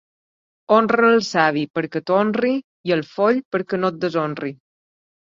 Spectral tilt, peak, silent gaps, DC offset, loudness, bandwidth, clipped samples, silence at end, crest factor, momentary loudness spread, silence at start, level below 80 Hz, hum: -6 dB/octave; -2 dBFS; 1.70-1.74 s, 2.64-2.84 s, 3.45-3.51 s; under 0.1%; -20 LUFS; 7.6 kHz; under 0.1%; 0.85 s; 18 dB; 10 LU; 0.7 s; -66 dBFS; none